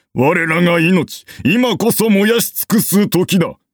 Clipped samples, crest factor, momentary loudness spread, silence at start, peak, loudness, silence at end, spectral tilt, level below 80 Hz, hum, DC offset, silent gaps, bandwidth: under 0.1%; 12 dB; 4 LU; 0.15 s; -2 dBFS; -14 LUFS; 0.2 s; -5 dB/octave; -52 dBFS; none; under 0.1%; none; over 20 kHz